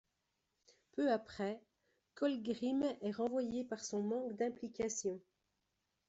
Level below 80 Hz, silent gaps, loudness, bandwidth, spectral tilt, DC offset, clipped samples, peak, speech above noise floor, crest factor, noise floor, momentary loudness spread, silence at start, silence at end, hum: -76 dBFS; none; -40 LUFS; 8.2 kHz; -4.5 dB/octave; under 0.1%; under 0.1%; -24 dBFS; 47 dB; 18 dB; -86 dBFS; 7 LU; 0.95 s; 0.9 s; none